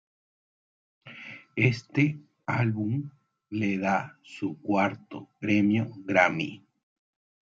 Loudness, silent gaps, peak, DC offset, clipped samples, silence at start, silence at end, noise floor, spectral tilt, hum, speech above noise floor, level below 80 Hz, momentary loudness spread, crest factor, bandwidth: -27 LUFS; none; -6 dBFS; under 0.1%; under 0.1%; 1.05 s; 0.85 s; -46 dBFS; -7 dB/octave; none; 19 dB; -72 dBFS; 19 LU; 22 dB; 7.6 kHz